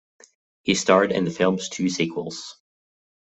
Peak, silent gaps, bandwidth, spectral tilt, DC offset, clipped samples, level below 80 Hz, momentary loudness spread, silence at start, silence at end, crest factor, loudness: -4 dBFS; none; 8.4 kHz; -4.5 dB/octave; under 0.1%; under 0.1%; -62 dBFS; 15 LU; 0.65 s; 0.7 s; 22 dB; -22 LUFS